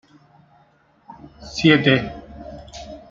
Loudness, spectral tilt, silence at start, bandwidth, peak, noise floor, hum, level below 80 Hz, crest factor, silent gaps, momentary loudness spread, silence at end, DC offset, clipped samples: -17 LUFS; -6 dB/octave; 1.4 s; 7.6 kHz; 0 dBFS; -57 dBFS; none; -48 dBFS; 22 dB; none; 23 LU; 0.15 s; under 0.1%; under 0.1%